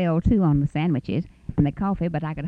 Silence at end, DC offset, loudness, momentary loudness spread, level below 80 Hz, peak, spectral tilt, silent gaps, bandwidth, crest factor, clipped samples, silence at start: 0 s; under 0.1%; -23 LUFS; 9 LU; -36 dBFS; -6 dBFS; -10 dB/octave; none; 5 kHz; 16 dB; under 0.1%; 0 s